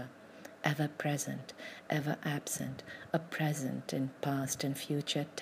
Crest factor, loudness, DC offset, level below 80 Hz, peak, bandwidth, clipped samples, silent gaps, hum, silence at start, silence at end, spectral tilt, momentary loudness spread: 22 dB; -36 LUFS; under 0.1%; -76 dBFS; -16 dBFS; 15.5 kHz; under 0.1%; none; none; 0 s; 0 s; -4.5 dB/octave; 12 LU